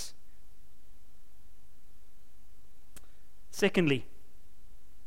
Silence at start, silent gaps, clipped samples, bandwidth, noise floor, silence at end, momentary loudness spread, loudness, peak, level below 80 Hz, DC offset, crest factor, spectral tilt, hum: 0 s; none; under 0.1%; 16.5 kHz; -59 dBFS; 1 s; 30 LU; -30 LUFS; -14 dBFS; -58 dBFS; 2%; 24 dB; -5 dB/octave; none